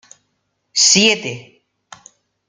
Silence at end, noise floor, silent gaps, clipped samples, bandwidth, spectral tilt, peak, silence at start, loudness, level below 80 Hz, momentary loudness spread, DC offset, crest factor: 1.1 s; -70 dBFS; none; under 0.1%; 11.5 kHz; -1 dB/octave; 0 dBFS; 0.75 s; -12 LUFS; -62 dBFS; 19 LU; under 0.1%; 20 dB